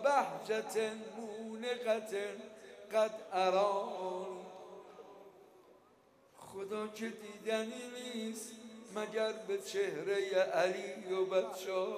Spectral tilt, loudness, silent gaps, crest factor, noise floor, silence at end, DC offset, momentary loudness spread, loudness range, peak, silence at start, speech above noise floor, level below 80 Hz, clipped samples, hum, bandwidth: -3.5 dB/octave; -37 LUFS; none; 20 dB; -66 dBFS; 0 s; under 0.1%; 19 LU; 8 LU; -18 dBFS; 0 s; 30 dB; -88 dBFS; under 0.1%; none; 15 kHz